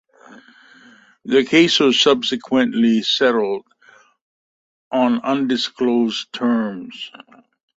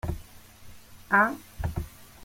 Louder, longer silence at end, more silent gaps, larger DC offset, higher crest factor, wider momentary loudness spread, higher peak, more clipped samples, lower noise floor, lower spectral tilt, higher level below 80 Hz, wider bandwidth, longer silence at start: first, -17 LUFS vs -27 LUFS; first, 0.7 s vs 0 s; first, 4.21-4.91 s vs none; neither; about the same, 18 dB vs 22 dB; second, 15 LU vs 18 LU; first, -2 dBFS vs -8 dBFS; neither; first, -52 dBFS vs -48 dBFS; second, -4 dB/octave vs -6 dB/octave; second, -64 dBFS vs -44 dBFS; second, 8 kHz vs 16.5 kHz; first, 0.3 s vs 0.05 s